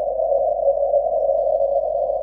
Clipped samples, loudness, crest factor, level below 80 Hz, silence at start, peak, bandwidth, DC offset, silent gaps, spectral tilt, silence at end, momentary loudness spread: under 0.1%; -20 LUFS; 12 dB; -48 dBFS; 0 s; -8 dBFS; 1.1 kHz; under 0.1%; none; -8 dB/octave; 0 s; 2 LU